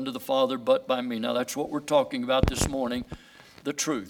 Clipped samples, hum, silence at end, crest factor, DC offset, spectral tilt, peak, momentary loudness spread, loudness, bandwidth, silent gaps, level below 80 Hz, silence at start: under 0.1%; none; 0 s; 22 dB; under 0.1%; -4.5 dB/octave; -4 dBFS; 10 LU; -27 LUFS; 18 kHz; none; -42 dBFS; 0 s